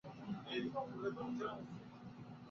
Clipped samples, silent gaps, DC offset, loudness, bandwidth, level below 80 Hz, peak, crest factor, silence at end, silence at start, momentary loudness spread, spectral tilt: under 0.1%; none; under 0.1%; -46 LUFS; 7.2 kHz; -76 dBFS; -30 dBFS; 16 dB; 0 s; 0.05 s; 12 LU; -4.5 dB/octave